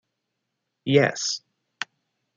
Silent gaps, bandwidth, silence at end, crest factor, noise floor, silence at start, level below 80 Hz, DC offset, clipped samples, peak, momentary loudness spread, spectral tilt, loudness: none; 9.4 kHz; 0.55 s; 24 dB; -80 dBFS; 0.85 s; -74 dBFS; under 0.1%; under 0.1%; -4 dBFS; 15 LU; -4 dB/octave; -23 LUFS